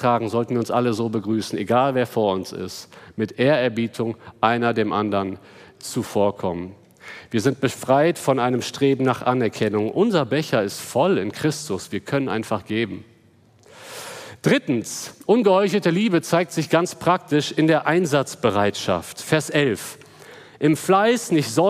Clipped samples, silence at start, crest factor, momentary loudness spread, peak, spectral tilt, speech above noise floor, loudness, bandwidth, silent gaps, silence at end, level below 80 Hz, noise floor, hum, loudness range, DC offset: under 0.1%; 0 s; 20 dB; 12 LU; -2 dBFS; -5.5 dB/octave; 34 dB; -21 LUFS; 15.5 kHz; none; 0 s; -64 dBFS; -54 dBFS; none; 5 LU; under 0.1%